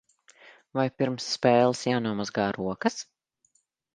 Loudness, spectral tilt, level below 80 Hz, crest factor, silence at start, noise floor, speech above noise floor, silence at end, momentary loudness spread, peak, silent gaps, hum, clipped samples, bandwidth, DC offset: -27 LUFS; -5 dB/octave; -64 dBFS; 22 dB; 0.45 s; -70 dBFS; 44 dB; 0.95 s; 10 LU; -6 dBFS; none; none; under 0.1%; 9.8 kHz; under 0.1%